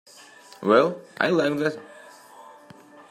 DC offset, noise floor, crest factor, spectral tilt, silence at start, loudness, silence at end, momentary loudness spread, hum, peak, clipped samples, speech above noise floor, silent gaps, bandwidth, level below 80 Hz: under 0.1%; -49 dBFS; 22 dB; -6 dB/octave; 0.6 s; -23 LUFS; 0.7 s; 16 LU; none; -4 dBFS; under 0.1%; 27 dB; none; 14.5 kHz; -74 dBFS